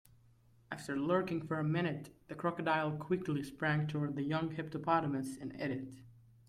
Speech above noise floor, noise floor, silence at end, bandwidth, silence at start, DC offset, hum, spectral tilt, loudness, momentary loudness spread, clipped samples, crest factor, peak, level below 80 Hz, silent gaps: 30 dB; -66 dBFS; 0.3 s; 13.5 kHz; 0.7 s; under 0.1%; none; -7 dB/octave; -37 LUFS; 10 LU; under 0.1%; 18 dB; -20 dBFS; -70 dBFS; none